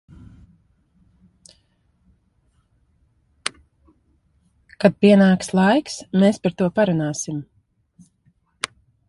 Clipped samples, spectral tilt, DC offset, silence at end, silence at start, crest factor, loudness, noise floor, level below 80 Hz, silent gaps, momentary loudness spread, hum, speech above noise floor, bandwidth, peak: under 0.1%; -6 dB/octave; under 0.1%; 0.4 s; 4.8 s; 22 dB; -19 LUFS; -63 dBFS; -56 dBFS; none; 17 LU; none; 46 dB; 11.5 kHz; -2 dBFS